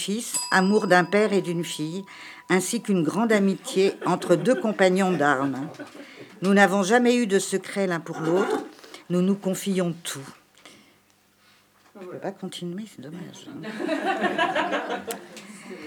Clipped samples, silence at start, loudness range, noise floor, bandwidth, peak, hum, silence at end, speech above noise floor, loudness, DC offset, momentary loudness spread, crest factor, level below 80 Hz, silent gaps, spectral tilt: under 0.1%; 0 s; 12 LU; -61 dBFS; 19 kHz; -2 dBFS; 50 Hz at -45 dBFS; 0 s; 37 dB; -23 LUFS; under 0.1%; 20 LU; 22 dB; -82 dBFS; none; -5 dB/octave